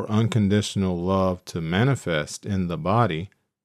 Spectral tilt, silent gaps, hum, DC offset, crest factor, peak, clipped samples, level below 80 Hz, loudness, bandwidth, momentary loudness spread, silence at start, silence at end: -6.5 dB/octave; none; none; under 0.1%; 16 dB; -6 dBFS; under 0.1%; -52 dBFS; -24 LUFS; 13.5 kHz; 7 LU; 0 s; 0.35 s